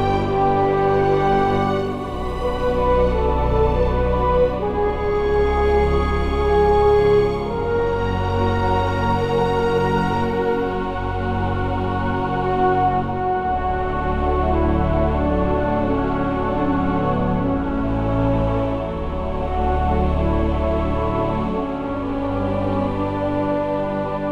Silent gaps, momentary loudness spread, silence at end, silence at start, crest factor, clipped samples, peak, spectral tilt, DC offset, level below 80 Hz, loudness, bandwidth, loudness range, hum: none; 6 LU; 0 s; 0 s; 14 dB; under 0.1%; -6 dBFS; -8.5 dB/octave; under 0.1%; -26 dBFS; -20 LUFS; 10 kHz; 3 LU; none